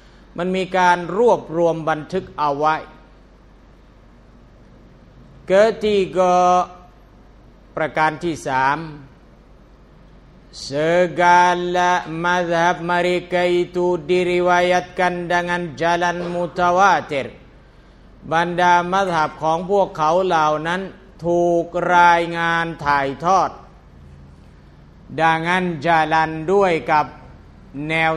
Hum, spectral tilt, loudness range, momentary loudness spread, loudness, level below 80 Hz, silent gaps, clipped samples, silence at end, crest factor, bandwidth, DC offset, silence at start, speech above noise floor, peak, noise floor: none; -5 dB/octave; 6 LU; 10 LU; -18 LUFS; -48 dBFS; none; under 0.1%; 0 s; 18 dB; 11.5 kHz; under 0.1%; 0.35 s; 29 dB; 0 dBFS; -47 dBFS